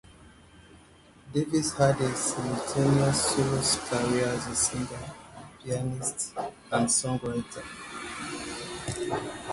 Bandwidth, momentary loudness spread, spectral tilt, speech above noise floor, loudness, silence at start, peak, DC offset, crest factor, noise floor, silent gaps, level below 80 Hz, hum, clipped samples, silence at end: 12 kHz; 14 LU; -4 dB/octave; 27 dB; -28 LUFS; 0.1 s; -10 dBFS; under 0.1%; 20 dB; -55 dBFS; none; -54 dBFS; none; under 0.1%; 0 s